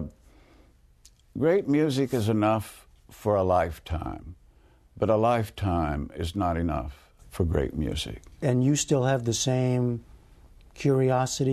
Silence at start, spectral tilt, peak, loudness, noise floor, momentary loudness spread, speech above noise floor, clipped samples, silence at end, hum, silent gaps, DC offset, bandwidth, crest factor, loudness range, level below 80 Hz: 0 s; -6 dB/octave; -10 dBFS; -26 LUFS; -57 dBFS; 11 LU; 32 dB; under 0.1%; 0 s; none; none; under 0.1%; 13.5 kHz; 16 dB; 2 LU; -44 dBFS